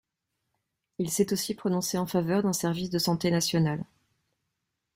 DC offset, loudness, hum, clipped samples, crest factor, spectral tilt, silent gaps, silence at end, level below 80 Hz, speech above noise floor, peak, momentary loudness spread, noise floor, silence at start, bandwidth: under 0.1%; -28 LUFS; none; under 0.1%; 18 dB; -5 dB/octave; none; 1.1 s; -64 dBFS; 55 dB; -12 dBFS; 8 LU; -82 dBFS; 1 s; 16.5 kHz